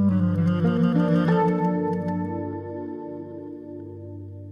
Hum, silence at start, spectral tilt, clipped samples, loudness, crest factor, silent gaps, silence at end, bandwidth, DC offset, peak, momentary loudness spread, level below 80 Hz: none; 0 s; -10 dB/octave; under 0.1%; -23 LUFS; 14 dB; none; 0 s; 5.4 kHz; under 0.1%; -10 dBFS; 18 LU; -62 dBFS